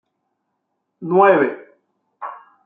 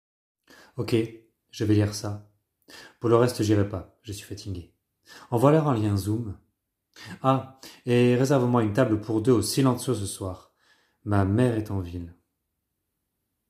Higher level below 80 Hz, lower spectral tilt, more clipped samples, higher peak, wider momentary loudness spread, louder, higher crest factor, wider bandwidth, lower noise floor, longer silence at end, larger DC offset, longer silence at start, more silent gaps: second, -72 dBFS vs -62 dBFS; first, -9.5 dB/octave vs -6.5 dB/octave; neither; first, 0 dBFS vs -4 dBFS; first, 21 LU vs 18 LU; first, -15 LUFS vs -25 LUFS; about the same, 20 dB vs 22 dB; second, 3.7 kHz vs 16 kHz; second, -74 dBFS vs -80 dBFS; second, 0.3 s vs 1.35 s; neither; first, 1 s vs 0.75 s; neither